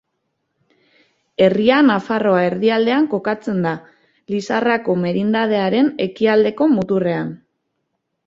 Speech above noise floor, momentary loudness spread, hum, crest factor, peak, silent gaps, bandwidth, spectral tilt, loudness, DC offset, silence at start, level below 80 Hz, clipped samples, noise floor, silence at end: 57 dB; 9 LU; none; 16 dB; -2 dBFS; none; 7.6 kHz; -7 dB/octave; -17 LUFS; under 0.1%; 1.4 s; -60 dBFS; under 0.1%; -73 dBFS; 0.9 s